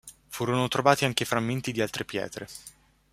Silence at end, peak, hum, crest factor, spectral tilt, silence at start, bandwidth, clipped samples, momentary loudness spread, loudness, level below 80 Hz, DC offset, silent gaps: 0.4 s; -4 dBFS; none; 24 dB; -4.5 dB/octave; 0.05 s; 16 kHz; under 0.1%; 18 LU; -27 LUFS; -60 dBFS; under 0.1%; none